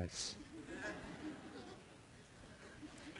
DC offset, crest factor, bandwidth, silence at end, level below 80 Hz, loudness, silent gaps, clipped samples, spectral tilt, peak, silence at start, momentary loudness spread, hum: under 0.1%; 22 dB; 11 kHz; 0 s; -66 dBFS; -50 LUFS; none; under 0.1%; -3.5 dB/octave; -28 dBFS; 0 s; 15 LU; none